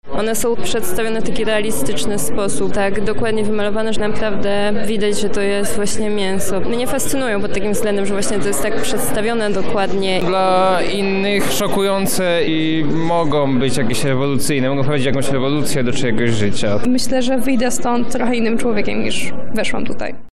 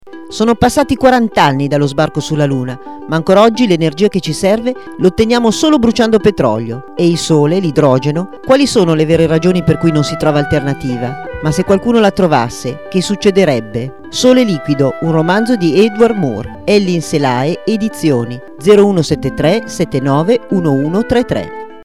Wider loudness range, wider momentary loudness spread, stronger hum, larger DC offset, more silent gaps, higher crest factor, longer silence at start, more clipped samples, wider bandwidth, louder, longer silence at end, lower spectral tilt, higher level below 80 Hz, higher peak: about the same, 3 LU vs 2 LU; second, 4 LU vs 9 LU; neither; first, 20% vs 1%; neither; about the same, 12 dB vs 12 dB; about the same, 0 s vs 0.05 s; neither; first, 16 kHz vs 14 kHz; second, -18 LUFS vs -12 LUFS; about the same, 0 s vs 0.05 s; second, -4.5 dB/octave vs -6 dB/octave; about the same, -36 dBFS vs -38 dBFS; second, -6 dBFS vs 0 dBFS